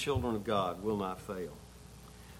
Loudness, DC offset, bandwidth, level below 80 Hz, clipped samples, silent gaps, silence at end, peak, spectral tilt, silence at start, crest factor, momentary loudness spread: -36 LUFS; under 0.1%; 16.5 kHz; -54 dBFS; under 0.1%; none; 0 s; -18 dBFS; -6 dB/octave; 0 s; 18 dB; 20 LU